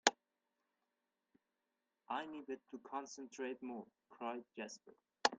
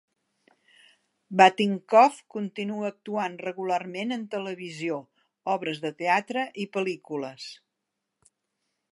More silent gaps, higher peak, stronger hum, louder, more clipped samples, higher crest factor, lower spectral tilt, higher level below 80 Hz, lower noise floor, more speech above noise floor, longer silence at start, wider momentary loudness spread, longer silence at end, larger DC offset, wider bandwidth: neither; second, -10 dBFS vs -2 dBFS; neither; second, -46 LUFS vs -26 LUFS; neither; first, 36 dB vs 26 dB; second, -1 dB/octave vs -5 dB/octave; second, -90 dBFS vs -82 dBFS; first, -90 dBFS vs -83 dBFS; second, 41 dB vs 57 dB; second, 0.05 s vs 1.3 s; second, 10 LU vs 16 LU; second, 0 s vs 1.4 s; neither; second, 9 kHz vs 11.5 kHz